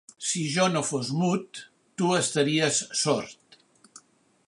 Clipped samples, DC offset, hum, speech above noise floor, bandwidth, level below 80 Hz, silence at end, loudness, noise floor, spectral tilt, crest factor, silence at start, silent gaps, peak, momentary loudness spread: under 0.1%; under 0.1%; none; 32 dB; 11.5 kHz; -72 dBFS; 0.5 s; -25 LUFS; -58 dBFS; -3.5 dB/octave; 20 dB; 0.2 s; none; -8 dBFS; 16 LU